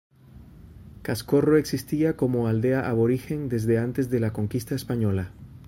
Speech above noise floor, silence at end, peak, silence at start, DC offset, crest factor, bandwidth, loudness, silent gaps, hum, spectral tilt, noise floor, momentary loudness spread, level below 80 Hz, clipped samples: 24 dB; 0.05 s; -8 dBFS; 0.35 s; under 0.1%; 18 dB; 16 kHz; -25 LUFS; none; none; -7.5 dB/octave; -48 dBFS; 8 LU; -50 dBFS; under 0.1%